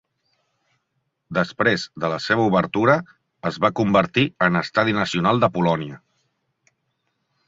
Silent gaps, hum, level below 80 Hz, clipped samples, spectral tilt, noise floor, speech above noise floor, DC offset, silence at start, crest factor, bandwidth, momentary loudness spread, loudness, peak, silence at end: none; none; -56 dBFS; under 0.1%; -6 dB/octave; -74 dBFS; 54 dB; under 0.1%; 1.3 s; 20 dB; 8 kHz; 8 LU; -20 LUFS; -2 dBFS; 1.5 s